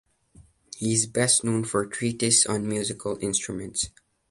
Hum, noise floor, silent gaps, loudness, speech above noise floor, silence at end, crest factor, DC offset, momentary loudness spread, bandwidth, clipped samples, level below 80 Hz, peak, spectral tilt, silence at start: none; -56 dBFS; none; -24 LUFS; 30 dB; 0.4 s; 20 dB; under 0.1%; 11 LU; 11.5 kHz; under 0.1%; -56 dBFS; -6 dBFS; -3 dB/octave; 0.4 s